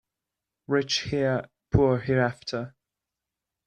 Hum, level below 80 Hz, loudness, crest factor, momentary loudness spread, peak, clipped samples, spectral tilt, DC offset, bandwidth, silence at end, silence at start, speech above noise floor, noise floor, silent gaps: none; -48 dBFS; -26 LUFS; 22 dB; 11 LU; -6 dBFS; under 0.1%; -5.5 dB/octave; under 0.1%; 9.4 kHz; 1 s; 0.7 s; 62 dB; -87 dBFS; none